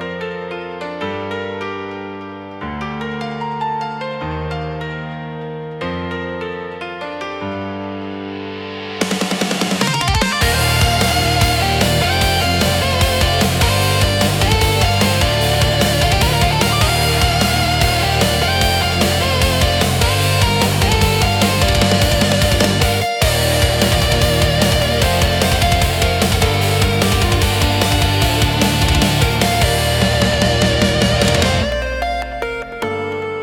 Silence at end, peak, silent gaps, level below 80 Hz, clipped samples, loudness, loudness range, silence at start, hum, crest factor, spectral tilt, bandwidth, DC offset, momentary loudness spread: 0 s; 0 dBFS; none; -26 dBFS; under 0.1%; -15 LUFS; 11 LU; 0 s; none; 16 dB; -4 dB/octave; 18 kHz; under 0.1%; 12 LU